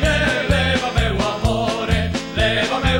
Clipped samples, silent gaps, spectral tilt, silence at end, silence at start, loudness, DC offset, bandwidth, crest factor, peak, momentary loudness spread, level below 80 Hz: under 0.1%; none; -5 dB/octave; 0 s; 0 s; -19 LUFS; under 0.1%; 16 kHz; 14 dB; -4 dBFS; 3 LU; -26 dBFS